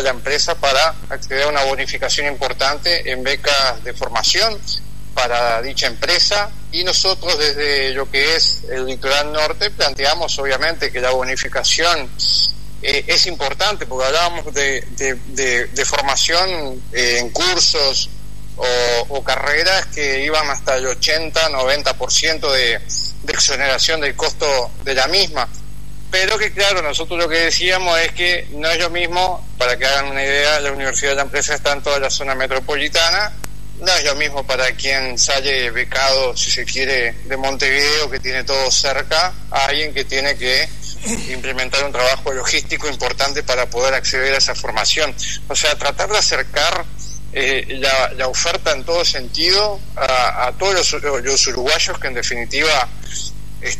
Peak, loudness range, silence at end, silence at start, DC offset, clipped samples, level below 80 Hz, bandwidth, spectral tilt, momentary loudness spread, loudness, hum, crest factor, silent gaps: -2 dBFS; 2 LU; 0 s; 0 s; 7%; under 0.1%; -36 dBFS; 13.5 kHz; -1 dB/octave; 7 LU; -16 LUFS; 50 Hz at -35 dBFS; 16 dB; none